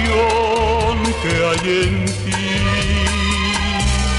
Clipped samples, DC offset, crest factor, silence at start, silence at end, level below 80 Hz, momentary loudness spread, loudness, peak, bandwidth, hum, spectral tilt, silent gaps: under 0.1%; under 0.1%; 12 dB; 0 s; 0 s; -24 dBFS; 3 LU; -17 LUFS; -4 dBFS; 11.5 kHz; none; -4.5 dB/octave; none